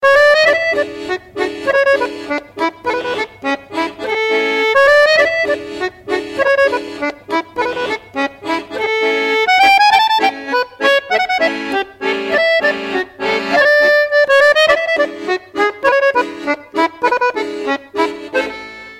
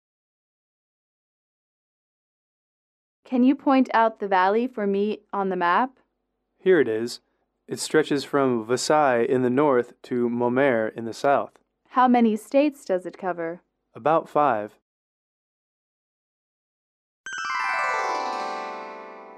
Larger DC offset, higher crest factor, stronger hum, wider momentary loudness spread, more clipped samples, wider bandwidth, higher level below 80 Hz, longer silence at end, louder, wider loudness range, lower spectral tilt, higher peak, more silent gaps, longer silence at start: neither; about the same, 14 dB vs 18 dB; neither; about the same, 12 LU vs 13 LU; neither; first, 15.5 kHz vs 13.5 kHz; first, -52 dBFS vs -76 dBFS; about the same, 0 s vs 0 s; first, -14 LUFS vs -23 LUFS; about the same, 5 LU vs 7 LU; second, -2.5 dB/octave vs -5 dB/octave; first, -2 dBFS vs -8 dBFS; second, none vs 14.82-17.24 s; second, 0 s vs 3.3 s